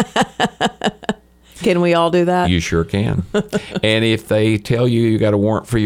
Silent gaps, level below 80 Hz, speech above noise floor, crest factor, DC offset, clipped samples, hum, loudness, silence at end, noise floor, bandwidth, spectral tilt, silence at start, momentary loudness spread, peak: none; -38 dBFS; 25 dB; 16 dB; under 0.1%; under 0.1%; none; -17 LUFS; 0 s; -41 dBFS; 16 kHz; -6 dB/octave; 0 s; 7 LU; 0 dBFS